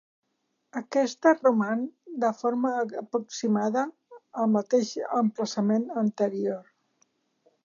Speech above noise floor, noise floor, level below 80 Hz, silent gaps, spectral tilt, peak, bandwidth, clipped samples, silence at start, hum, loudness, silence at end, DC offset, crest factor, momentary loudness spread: 51 dB; -77 dBFS; -84 dBFS; none; -5.5 dB/octave; -8 dBFS; 7.4 kHz; under 0.1%; 0.75 s; none; -27 LUFS; 1.05 s; under 0.1%; 20 dB; 9 LU